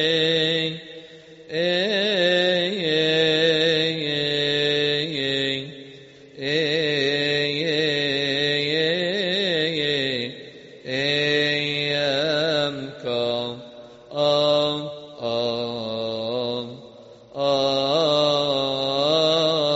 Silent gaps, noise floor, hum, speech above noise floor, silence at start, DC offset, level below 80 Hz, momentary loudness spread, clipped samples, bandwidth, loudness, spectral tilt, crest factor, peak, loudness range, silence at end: none; -45 dBFS; none; 23 dB; 0 s; under 0.1%; -62 dBFS; 12 LU; under 0.1%; 8 kHz; -21 LUFS; -2 dB/octave; 16 dB; -6 dBFS; 4 LU; 0 s